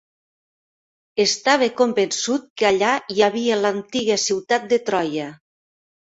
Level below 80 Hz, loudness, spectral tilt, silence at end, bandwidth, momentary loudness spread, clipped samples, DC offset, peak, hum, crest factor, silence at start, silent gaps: -64 dBFS; -20 LUFS; -2.5 dB/octave; 0.75 s; 8 kHz; 6 LU; under 0.1%; under 0.1%; -2 dBFS; none; 20 dB; 1.15 s; 2.50-2.56 s